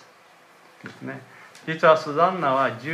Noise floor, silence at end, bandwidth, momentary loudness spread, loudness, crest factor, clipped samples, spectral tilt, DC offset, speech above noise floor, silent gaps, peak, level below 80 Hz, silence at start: -53 dBFS; 0 s; 12 kHz; 22 LU; -21 LUFS; 22 dB; under 0.1%; -6 dB/octave; under 0.1%; 31 dB; none; -4 dBFS; -78 dBFS; 0.85 s